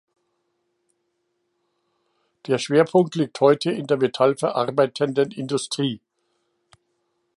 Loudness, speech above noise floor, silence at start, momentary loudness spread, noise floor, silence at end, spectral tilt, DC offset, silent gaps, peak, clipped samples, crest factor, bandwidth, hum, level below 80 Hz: -21 LUFS; 53 dB; 2.45 s; 8 LU; -73 dBFS; 1.4 s; -5.5 dB/octave; under 0.1%; none; -4 dBFS; under 0.1%; 20 dB; 11.5 kHz; none; -72 dBFS